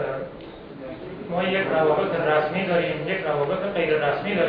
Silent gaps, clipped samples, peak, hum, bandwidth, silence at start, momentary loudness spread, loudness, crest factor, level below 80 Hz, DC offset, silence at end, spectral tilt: none; under 0.1%; -8 dBFS; none; 5.2 kHz; 0 s; 16 LU; -23 LUFS; 16 dB; -54 dBFS; under 0.1%; 0 s; -9 dB/octave